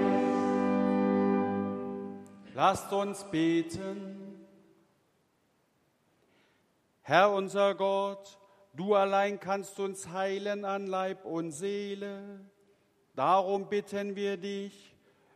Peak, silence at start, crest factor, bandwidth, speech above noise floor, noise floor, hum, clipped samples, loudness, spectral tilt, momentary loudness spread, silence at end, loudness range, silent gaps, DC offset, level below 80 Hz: -8 dBFS; 0 s; 24 dB; 14 kHz; 42 dB; -72 dBFS; none; under 0.1%; -30 LUFS; -5.5 dB/octave; 16 LU; 0.6 s; 7 LU; none; under 0.1%; -74 dBFS